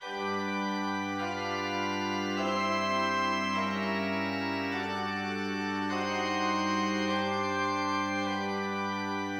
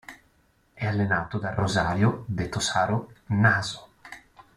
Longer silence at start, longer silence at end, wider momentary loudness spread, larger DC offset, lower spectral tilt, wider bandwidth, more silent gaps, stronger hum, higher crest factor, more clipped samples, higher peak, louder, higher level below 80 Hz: about the same, 0 s vs 0.1 s; second, 0 s vs 0.4 s; second, 4 LU vs 23 LU; neither; about the same, -4.5 dB/octave vs -5 dB/octave; first, 17 kHz vs 12.5 kHz; neither; neither; second, 14 dB vs 20 dB; neither; second, -18 dBFS vs -6 dBFS; second, -31 LUFS vs -25 LUFS; second, -76 dBFS vs -52 dBFS